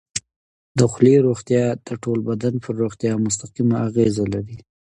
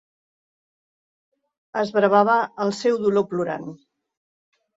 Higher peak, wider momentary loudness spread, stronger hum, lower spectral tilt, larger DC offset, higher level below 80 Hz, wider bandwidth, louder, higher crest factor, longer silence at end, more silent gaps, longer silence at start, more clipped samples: first, 0 dBFS vs -4 dBFS; about the same, 13 LU vs 13 LU; neither; about the same, -6.5 dB/octave vs -6 dB/octave; neither; first, -52 dBFS vs -70 dBFS; first, 11 kHz vs 7.8 kHz; about the same, -20 LUFS vs -21 LUFS; about the same, 20 dB vs 20 dB; second, 0.35 s vs 1 s; first, 0.36-0.75 s vs none; second, 0.15 s vs 1.75 s; neither